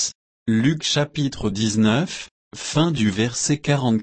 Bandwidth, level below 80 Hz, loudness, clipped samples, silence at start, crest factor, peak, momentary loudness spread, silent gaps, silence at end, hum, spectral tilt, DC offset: 8.8 kHz; -50 dBFS; -21 LUFS; under 0.1%; 0 s; 14 dB; -6 dBFS; 10 LU; 0.15-0.46 s, 2.31-2.51 s; 0 s; none; -4.5 dB/octave; under 0.1%